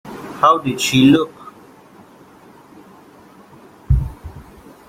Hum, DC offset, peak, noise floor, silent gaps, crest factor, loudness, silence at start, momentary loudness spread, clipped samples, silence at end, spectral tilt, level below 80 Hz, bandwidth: none; under 0.1%; -2 dBFS; -45 dBFS; none; 18 dB; -15 LUFS; 0.05 s; 25 LU; under 0.1%; 0.45 s; -5.5 dB/octave; -32 dBFS; 16 kHz